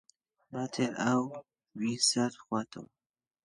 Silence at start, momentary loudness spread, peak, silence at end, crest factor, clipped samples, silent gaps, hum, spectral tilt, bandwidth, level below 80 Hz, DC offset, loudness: 0.5 s; 19 LU; -14 dBFS; 0.6 s; 20 dB; under 0.1%; none; none; -3.5 dB/octave; 11.5 kHz; -78 dBFS; under 0.1%; -31 LUFS